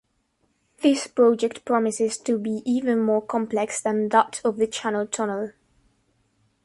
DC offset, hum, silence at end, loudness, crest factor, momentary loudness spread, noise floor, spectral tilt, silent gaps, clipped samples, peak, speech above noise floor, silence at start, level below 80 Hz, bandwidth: under 0.1%; none; 1.15 s; -23 LUFS; 20 dB; 7 LU; -70 dBFS; -4 dB/octave; none; under 0.1%; -4 dBFS; 47 dB; 0.8 s; -68 dBFS; 11.5 kHz